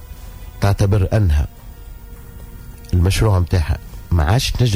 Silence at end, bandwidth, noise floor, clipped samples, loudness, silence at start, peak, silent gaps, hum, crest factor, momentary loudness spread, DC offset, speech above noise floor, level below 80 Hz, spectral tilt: 0 s; 16 kHz; -35 dBFS; under 0.1%; -18 LUFS; 0 s; -6 dBFS; none; none; 12 dB; 22 LU; under 0.1%; 20 dB; -24 dBFS; -6 dB/octave